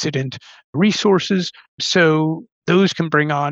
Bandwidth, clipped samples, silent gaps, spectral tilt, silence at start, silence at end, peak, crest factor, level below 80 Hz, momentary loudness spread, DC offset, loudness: 8 kHz; under 0.1%; 0.64-0.73 s, 1.68-1.78 s, 2.52-2.62 s; -5 dB/octave; 0 s; 0 s; -2 dBFS; 16 dB; -64 dBFS; 13 LU; under 0.1%; -17 LUFS